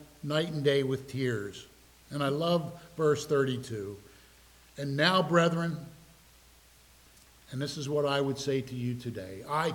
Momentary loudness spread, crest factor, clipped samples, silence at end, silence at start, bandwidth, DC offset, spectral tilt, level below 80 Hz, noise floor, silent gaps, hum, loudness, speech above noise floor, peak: 16 LU; 22 dB; under 0.1%; 0 s; 0 s; 19 kHz; under 0.1%; -5.5 dB/octave; -64 dBFS; -59 dBFS; none; none; -30 LUFS; 29 dB; -8 dBFS